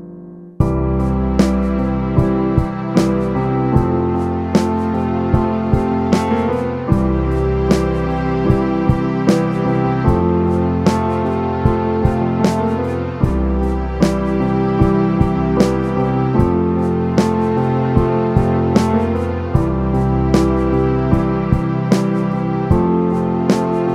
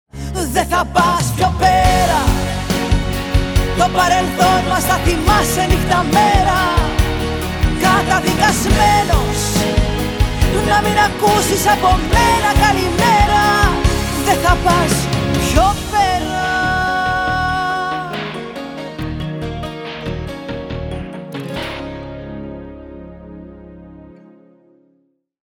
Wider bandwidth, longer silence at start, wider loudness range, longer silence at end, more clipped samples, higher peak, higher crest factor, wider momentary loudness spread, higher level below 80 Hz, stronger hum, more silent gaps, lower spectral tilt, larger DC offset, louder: second, 12.5 kHz vs over 20 kHz; second, 0 s vs 0.15 s; second, 1 LU vs 14 LU; second, 0 s vs 1.45 s; neither; about the same, 0 dBFS vs 0 dBFS; about the same, 16 dB vs 16 dB; second, 3 LU vs 14 LU; about the same, -26 dBFS vs -24 dBFS; neither; neither; first, -8 dB/octave vs -4.5 dB/octave; neither; about the same, -16 LUFS vs -15 LUFS